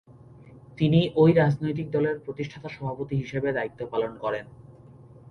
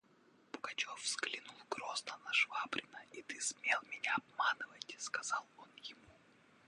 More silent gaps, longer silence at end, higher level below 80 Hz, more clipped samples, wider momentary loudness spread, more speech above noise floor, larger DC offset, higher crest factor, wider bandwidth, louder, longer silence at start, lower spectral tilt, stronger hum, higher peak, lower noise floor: neither; second, 0 s vs 0.55 s; first, -56 dBFS vs -86 dBFS; neither; about the same, 15 LU vs 17 LU; second, 24 dB vs 28 dB; neither; about the same, 20 dB vs 22 dB; second, 6.4 kHz vs 11 kHz; first, -26 LUFS vs -39 LUFS; second, 0.1 s vs 0.55 s; first, -8.5 dB/octave vs 0.5 dB/octave; neither; first, -8 dBFS vs -20 dBFS; second, -49 dBFS vs -69 dBFS